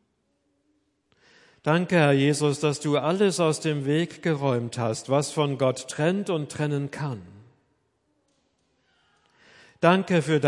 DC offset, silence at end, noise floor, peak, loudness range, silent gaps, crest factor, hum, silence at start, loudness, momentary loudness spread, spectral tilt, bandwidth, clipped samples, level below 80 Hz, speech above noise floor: under 0.1%; 0 s; -72 dBFS; -2 dBFS; 9 LU; none; 22 dB; none; 1.65 s; -24 LUFS; 9 LU; -5.5 dB/octave; 11.5 kHz; under 0.1%; -72 dBFS; 48 dB